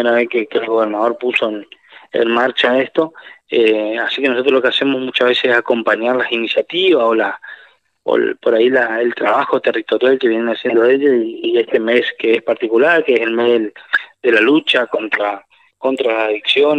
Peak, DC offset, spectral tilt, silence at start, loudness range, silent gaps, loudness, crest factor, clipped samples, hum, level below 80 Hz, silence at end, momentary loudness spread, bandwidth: 0 dBFS; under 0.1%; -5 dB/octave; 0 s; 2 LU; none; -15 LUFS; 14 dB; under 0.1%; none; -70 dBFS; 0 s; 6 LU; 8.6 kHz